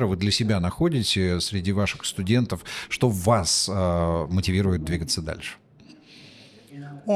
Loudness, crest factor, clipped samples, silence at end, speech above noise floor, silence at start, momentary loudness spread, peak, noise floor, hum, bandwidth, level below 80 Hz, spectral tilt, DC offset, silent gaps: -24 LUFS; 18 dB; under 0.1%; 0 s; 27 dB; 0 s; 11 LU; -8 dBFS; -50 dBFS; none; 15 kHz; -44 dBFS; -4.5 dB/octave; under 0.1%; none